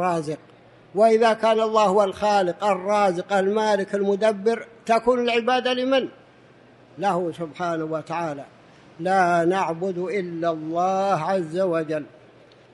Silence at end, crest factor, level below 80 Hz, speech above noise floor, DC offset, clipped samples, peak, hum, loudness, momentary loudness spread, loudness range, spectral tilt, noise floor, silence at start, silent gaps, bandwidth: 0.65 s; 16 dB; -66 dBFS; 30 dB; under 0.1%; under 0.1%; -6 dBFS; none; -22 LUFS; 11 LU; 5 LU; -5.5 dB/octave; -51 dBFS; 0 s; none; 11.5 kHz